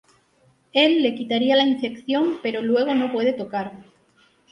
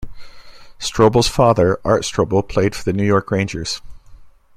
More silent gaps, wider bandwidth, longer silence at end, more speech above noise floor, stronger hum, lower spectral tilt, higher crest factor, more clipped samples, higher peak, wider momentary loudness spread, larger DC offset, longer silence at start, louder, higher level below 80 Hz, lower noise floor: neither; second, 9.8 kHz vs 15.5 kHz; first, 0.7 s vs 0.25 s; first, 40 dB vs 25 dB; neither; about the same, -5.5 dB/octave vs -5.5 dB/octave; about the same, 18 dB vs 16 dB; neither; about the same, -4 dBFS vs -2 dBFS; about the same, 10 LU vs 11 LU; neither; first, 0.75 s vs 0 s; second, -21 LUFS vs -17 LUFS; second, -68 dBFS vs -38 dBFS; first, -61 dBFS vs -41 dBFS